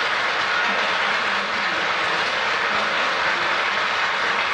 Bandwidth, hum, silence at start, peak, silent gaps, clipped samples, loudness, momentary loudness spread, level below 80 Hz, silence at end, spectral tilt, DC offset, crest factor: 13 kHz; none; 0 s; -8 dBFS; none; under 0.1%; -20 LUFS; 1 LU; -60 dBFS; 0 s; -1.5 dB/octave; under 0.1%; 14 dB